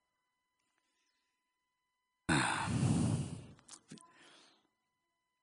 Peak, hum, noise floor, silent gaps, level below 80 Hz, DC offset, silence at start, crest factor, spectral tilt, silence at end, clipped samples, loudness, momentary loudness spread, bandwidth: -20 dBFS; none; -86 dBFS; none; -62 dBFS; under 0.1%; 2.3 s; 22 dB; -5 dB/octave; 1.45 s; under 0.1%; -35 LUFS; 23 LU; 10.5 kHz